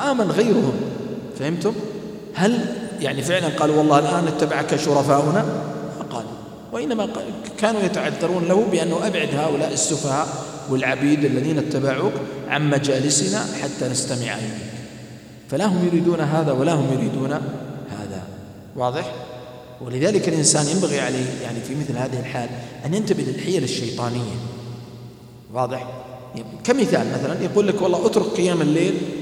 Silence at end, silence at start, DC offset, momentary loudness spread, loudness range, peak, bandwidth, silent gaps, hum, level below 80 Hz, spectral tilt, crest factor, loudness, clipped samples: 0 s; 0 s; under 0.1%; 15 LU; 5 LU; -2 dBFS; 16 kHz; none; none; -58 dBFS; -5 dB/octave; 20 dB; -21 LUFS; under 0.1%